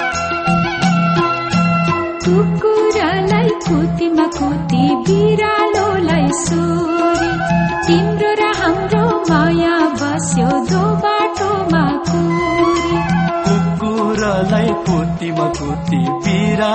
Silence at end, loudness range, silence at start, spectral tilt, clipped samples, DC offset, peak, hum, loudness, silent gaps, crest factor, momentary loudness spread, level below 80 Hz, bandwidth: 0 s; 1 LU; 0 s; -6 dB/octave; under 0.1%; under 0.1%; -2 dBFS; none; -15 LUFS; none; 12 dB; 4 LU; -36 dBFS; 8.8 kHz